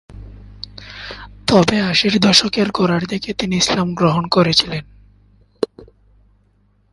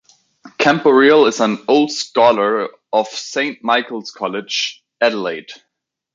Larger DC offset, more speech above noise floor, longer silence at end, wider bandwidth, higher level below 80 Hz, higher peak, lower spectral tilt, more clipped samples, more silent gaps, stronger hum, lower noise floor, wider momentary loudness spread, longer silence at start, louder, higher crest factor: neither; second, 42 dB vs 61 dB; first, 1.1 s vs 0.6 s; first, 11.5 kHz vs 7.6 kHz; first, -44 dBFS vs -64 dBFS; about the same, 0 dBFS vs 0 dBFS; about the same, -4.5 dB/octave vs -3.5 dB/octave; neither; neither; first, 50 Hz at -40 dBFS vs none; second, -58 dBFS vs -76 dBFS; first, 20 LU vs 12 LU; second, 0.1 s vs 0.45 s; about the same, -16 LUFS vs -16 LUFS; about the same, 18 dB vs 16 dB